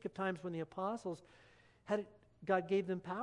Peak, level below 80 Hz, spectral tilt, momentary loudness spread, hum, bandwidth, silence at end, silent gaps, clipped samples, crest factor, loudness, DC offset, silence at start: -20 dBFS; -76 dBFS; -7 dB/octave; 15 LU; none; 10.5 kHz; 0 s; none; under 0.1%; 20 dB; -40 LUFS; under 0.1%; 0.05 s